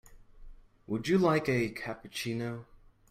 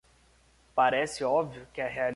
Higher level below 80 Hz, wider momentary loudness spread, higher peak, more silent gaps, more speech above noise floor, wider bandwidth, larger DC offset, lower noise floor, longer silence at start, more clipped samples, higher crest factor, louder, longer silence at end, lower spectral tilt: first, -56 dBFS vs -62 dBFS; first, 13 LU vs 10 LU; about the same, -14 dBFS vs -12 dBFS; neither; second, 20 dB vs 34 dB; first, 16 kHz vs 11.5 kHz; neither; second, -50 dBFS vs -63 dBFS; second, 0.1 s vs 0.75 s; neither; about the same, 18 dB vs 18 dB; about the same, -31 LUFS vs -29 LUFS; first, 0.5 s vs 0 s; first, -6 dB/octave vs -4 dB/octave